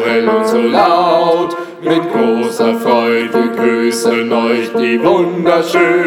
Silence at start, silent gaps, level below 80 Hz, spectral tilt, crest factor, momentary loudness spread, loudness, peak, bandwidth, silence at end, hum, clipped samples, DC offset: 0 s; none; -60 dBFS; -5 dB/octave; 12 dB; 4 LU; -12 LUFS; 0 dBFS; 16.5 kHz; 0 s; none; under 0.1%; under 0.1%